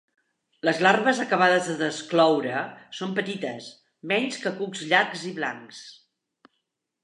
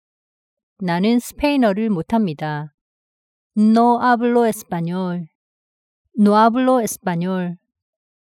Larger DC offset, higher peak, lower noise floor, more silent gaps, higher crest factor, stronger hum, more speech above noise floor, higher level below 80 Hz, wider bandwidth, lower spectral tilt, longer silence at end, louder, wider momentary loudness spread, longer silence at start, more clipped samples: neither; about the same, -4 dBFS vs -4 dBFS; second, -79 dBFS vs under -90 dBFS; second, none vs 2.74-3.50 s, 5.35-6.05 s; first, 22 dB vs 16 dB; neither; second, 54 dB vs over 73 dB; second, -82 dBFS vs -52 dBFS; second, 11.5 kHz vs 16.5 kHz; second, -4 dB/octave vs -6 dB/octave; first, 1.1 s vs 0.8 s; second, -24 LUFS vs -18 LUFS; first, 18 LU vs 14 LU; second, 0.65 s vs 0.8 s; neither